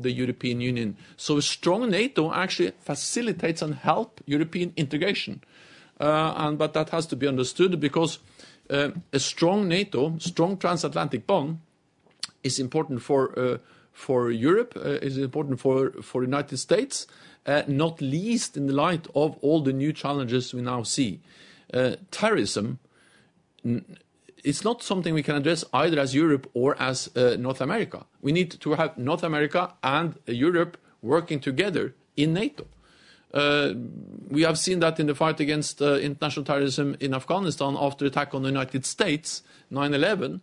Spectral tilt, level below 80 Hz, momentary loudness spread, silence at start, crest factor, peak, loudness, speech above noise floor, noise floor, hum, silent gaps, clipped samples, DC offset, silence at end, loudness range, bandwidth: -5 dB/octave; -64 dBFS; 7 LU; 0 s; 20 dB; -6 dBFS; -26 LUFS; 38 dB; -64 dBFS; none; none; under 0.1%; under 0.1%; 0.05 s; 3 LU; 11 kHz